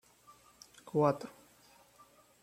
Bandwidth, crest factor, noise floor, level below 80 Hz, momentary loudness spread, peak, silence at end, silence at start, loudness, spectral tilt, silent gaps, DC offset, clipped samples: 16.5 kHz; 24 dB; -63 dBFS; -78 dBFS; 26 LU; -14 dBFS; 1.15 s; 0.85 s; -33 LUFS; -7.5 dB/octave; none; under 0.1%; under 0.1%